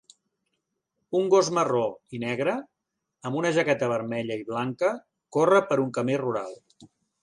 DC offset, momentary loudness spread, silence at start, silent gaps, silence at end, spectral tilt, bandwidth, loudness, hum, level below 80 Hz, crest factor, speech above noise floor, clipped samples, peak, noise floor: under 0.1%; 12 LU; 1.1 s; none; 0.35 s; -5.5 dB/octave; 11 kHz; -26 LUFS; none; -72 dBFS; 18 dB; 58 dB; under 0.1%; -8 dBFS; -82 dBFS